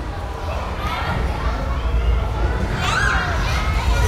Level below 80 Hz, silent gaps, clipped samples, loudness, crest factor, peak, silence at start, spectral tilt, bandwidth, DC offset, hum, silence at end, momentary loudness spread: -22 dBFS; none; under 0.1%; -22 LUFS; 14 dB; -4 dBFS; 0 s; -5 dB/octave; 14 kHz; under 0.1%; none; 0 s; 8 LU